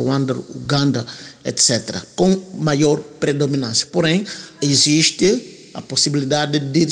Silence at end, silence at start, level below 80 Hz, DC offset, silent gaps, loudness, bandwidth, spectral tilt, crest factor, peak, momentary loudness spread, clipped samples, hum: 0 s; 0 s; -54 dBFS; under 0.1%; none; -17 LUFS; 10.5 kHz; -4 dB/octave; 14 dB; -4 dBFS; 11 LU; under 0.1%; none